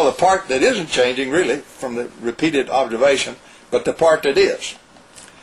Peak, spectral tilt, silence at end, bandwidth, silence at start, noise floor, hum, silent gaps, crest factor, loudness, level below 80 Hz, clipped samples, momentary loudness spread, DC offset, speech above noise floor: -4 dBFS; -3.5 dB/octave; 0.15 s; 13.5 kHz; 0 s; -44 dBFS; none; none; 14 dB; -18 LUFS; -52 dBFS; under 0.1%; 11 LU; under 0.1%; 26 dB